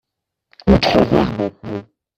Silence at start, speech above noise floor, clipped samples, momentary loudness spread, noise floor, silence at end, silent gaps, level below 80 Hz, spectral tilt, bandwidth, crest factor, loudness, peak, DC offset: 0.65 s; 56 dB; under 0.1%; 16 LU; -73 dBFS; 0.35 s; none; -32 dBFS; -7 dB/octave; 13 kHz; 18 dB; -16 LUFS; 0 dBFS; under 0.1%